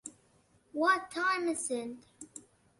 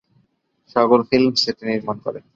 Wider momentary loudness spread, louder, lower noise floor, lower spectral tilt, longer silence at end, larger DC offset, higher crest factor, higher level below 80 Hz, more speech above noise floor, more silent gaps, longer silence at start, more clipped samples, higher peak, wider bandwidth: first, 20 LU vs 10 LU; second, -32 LUFS vs -19 LUFS; about the same, -68 dBFS vs -65 dBFS; second, -2 dB/octave vs -5 dB/octave; first, 0.4 s vs 0.15 s; neither; about the same, 20 dB vs 18 dB; second, -76 dBFS vs -60 dBFS; second, 35 dB vs 46 dB; neither; second, 0.05 s vs 0.75 s; neither; second, -14 dBFS vs -2 dBFS; first, 11.5 kHz vs 7.6 kHz